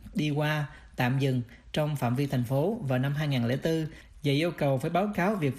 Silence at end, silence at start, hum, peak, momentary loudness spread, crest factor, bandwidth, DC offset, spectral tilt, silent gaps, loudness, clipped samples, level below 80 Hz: 0 s; 0.05 s; none; -14 dBFS; 6 LU; 14 dB; 15.5 kHz; under 0.1%; -7 dB/octave; none; -29 LUFS; under 0.1%; -54 dBFS